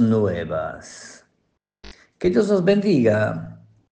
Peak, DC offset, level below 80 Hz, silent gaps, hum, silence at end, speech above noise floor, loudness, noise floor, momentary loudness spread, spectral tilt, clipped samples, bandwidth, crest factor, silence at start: -4 dBFS; under 0.1%; -54 dBFS; none; none; 0.35 s; 52 dB; -20 LUFS; -71 dBFS; 20 LU; -7 dB/octave; under 0.1%; 9.2 kHz; 18 dB; 0 s